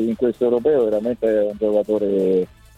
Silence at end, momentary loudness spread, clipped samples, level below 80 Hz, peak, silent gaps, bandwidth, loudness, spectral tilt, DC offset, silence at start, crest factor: 0.3 s; 3 LU; under 0.1%; -52 dBFS; -6 dBFS; none; 9.6 kHz; -19 LUFS; -8.5 dB/octave; under 0.1%; 0 s; 12 dB